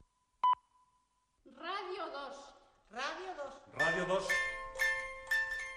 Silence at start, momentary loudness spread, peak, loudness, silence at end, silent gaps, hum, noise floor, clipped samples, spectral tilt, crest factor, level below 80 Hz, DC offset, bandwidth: 0.45 s; 14 LU; -20 dBFS; -36 LUFS; 0 s; none; none; -77 dBFS; under 0.1%; -2.5 dB/octave; 18 dB; -62 dBFS; under 0.1%; 13 kHz